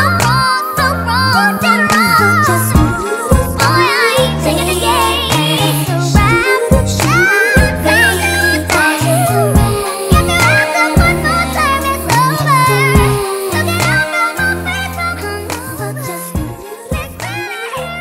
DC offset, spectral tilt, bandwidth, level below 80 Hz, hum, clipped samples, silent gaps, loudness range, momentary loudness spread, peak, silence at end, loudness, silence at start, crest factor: under 0.1%; -4.5 dB/octave; 16.5 kHz; -24 dBFS; none; under 0.1%; none; 5 LU; 11 LU; 0 dBFS; 0 s; -12 LUFS; 0 s; 12 dB